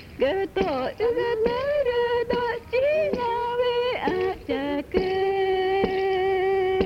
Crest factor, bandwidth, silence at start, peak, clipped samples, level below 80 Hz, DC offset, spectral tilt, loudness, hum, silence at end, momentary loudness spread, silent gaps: 16 dB; 6.8 kHz; 0 s; -8 dBFS; under 0.1%; -48 dBFS; under 0.1%; -6.5 dB/octave; -24 LUFS; none; 0 s; 3 LU; none